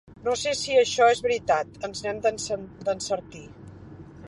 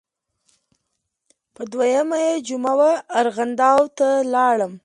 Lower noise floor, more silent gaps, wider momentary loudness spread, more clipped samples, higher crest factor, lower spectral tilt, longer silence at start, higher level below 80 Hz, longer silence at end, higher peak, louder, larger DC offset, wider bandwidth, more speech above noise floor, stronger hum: second, -44 dBFS vs -76 dBFS; neither; first, 25 LU vs 6 LU; neither; about the same, 20 dB vs 18 dB; second, -2.5 dB/octave vs -4 dB/octave; second, 0.1 s vs 1.6 s; first, -56 dBFS vs -72 dBFS; about the same, 0 s vs 0.1 s; second, -6 dBFS vs -2 dBFS; second, -25 LUFS vs -19 LUFS; neither; about the same, 11.5 kHz vs 11.5 kHz; second, 19 dB vs 57 dB; neither